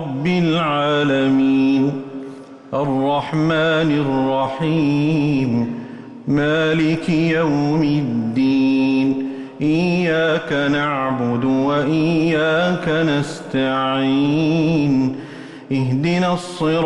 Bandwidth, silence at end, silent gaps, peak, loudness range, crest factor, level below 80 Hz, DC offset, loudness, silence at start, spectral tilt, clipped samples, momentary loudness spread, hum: 10.5 kHz; 0 s; none; -8 dBFS; 1 LU; 10 dB; -50 dBFS; under 0.1%; -18 LUFS; 0 s; -7 dB/octave; under 0.1%; 7 LU; none